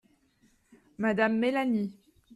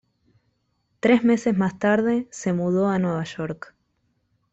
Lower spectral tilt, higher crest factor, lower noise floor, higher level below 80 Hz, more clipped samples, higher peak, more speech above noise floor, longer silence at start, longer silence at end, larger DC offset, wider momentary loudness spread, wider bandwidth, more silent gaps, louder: about the same, -7 dB/octave vs -6.5 dB/octave; about the same, 16 dB vs 18 dB; second, -67 dBFS vs -71 dBFS; second, -70 dBFS vs -60 dBFS; neither; second, -14 dBFS vs -6 dBFS; second, 40 dB vs 49 dB; about the same, 1 s vs 1.05 s; second, 0.45 s vs 0.95 s; neither; second, 6 LU vs 12 LU; first, 11.5 kHz vs 8 kHz; neither; second, -28 LUFS vs -22 LUFS